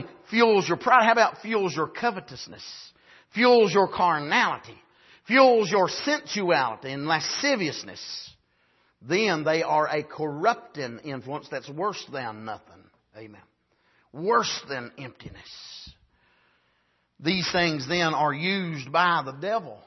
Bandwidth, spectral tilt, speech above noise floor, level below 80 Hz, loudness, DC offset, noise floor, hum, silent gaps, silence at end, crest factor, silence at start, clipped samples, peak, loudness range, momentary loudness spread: 6.2 kHz; -4 dB/octave; 45 dB; -66 dBFS; -24 LUFS; under 0.1%; -70 dBFS; none; none; 0.1 s; 22 dB; 0 s; under 0.1%; -4 dBFS; 9 LU; 20 LU